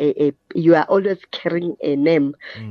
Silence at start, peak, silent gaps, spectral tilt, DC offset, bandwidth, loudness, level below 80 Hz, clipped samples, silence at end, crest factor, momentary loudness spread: 0 s; -2 dBFS; none; -8.5 dB/octave; under 0.1%; 6.4 kHz; -19 LUFS; -68 dBFS; under 0.1%; 0 s; 16 dB; 9 LU